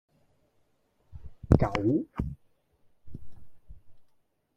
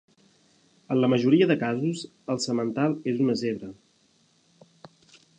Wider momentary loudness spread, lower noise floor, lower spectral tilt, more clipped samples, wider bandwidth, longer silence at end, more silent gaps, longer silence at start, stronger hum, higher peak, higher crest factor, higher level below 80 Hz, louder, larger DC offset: first, 26 LU vs 12 LU; first, -70 dBFS vs -64 dBFS; first, -9 dB/octave vs -6 dB/octave; neither; about the same, 9.2 kHz vs 9.6 kHz; second, 0.55 s vs 1.65 s; neither; first, 1.1 s vs 0.9 s; neither; first, -2 dBFS vs -8 dBFS; first, 30 dB vs 18 dB; first, -42 dBFS vs -72 dBFS; second, -28 LUFS vs -25 LUFS; neither